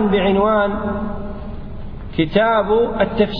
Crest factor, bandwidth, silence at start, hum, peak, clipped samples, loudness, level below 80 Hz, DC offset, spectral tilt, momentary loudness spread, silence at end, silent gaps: 16 dB; 5.2 kHz; 0 s; none; -2 dBFS; under 0.1%; -17 LUFS; -32 dBFS; under 0.1%; -9.5 dB/octave; 17 LU; 0 s; none